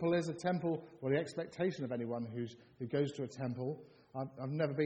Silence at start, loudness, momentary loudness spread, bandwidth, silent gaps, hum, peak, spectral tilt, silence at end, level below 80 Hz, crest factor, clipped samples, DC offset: 0 s; -39 LUFS; 9 LU; 9.4 kHz; none; none; -20 dBFS; -7 dB/octave; 0 s; -76 dBFS; 16 dB; under 0.1%; under 0.1%